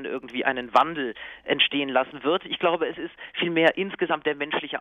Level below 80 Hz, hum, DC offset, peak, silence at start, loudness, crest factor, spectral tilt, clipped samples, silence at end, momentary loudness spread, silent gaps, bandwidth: -64 dBFS; none; under 0.1%; -4 dBFS; 0 s; -24 LUFS; 22 dB; -5.5 dB/octave; under 0.1%; 0 s; 10 LU; none; 9.8 kHz